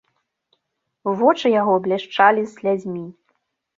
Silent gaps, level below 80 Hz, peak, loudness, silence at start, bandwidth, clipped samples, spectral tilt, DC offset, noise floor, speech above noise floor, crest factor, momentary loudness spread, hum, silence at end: none; -70 dBFS; -2 dBFS; -19 LUFS; 1.05 s; 7.8 kHz; under 0.1%; -6 dB/octave; under 0.1%; -76 dBFS; 58 dB; 18 dB; 14 LU; none; 0.65 s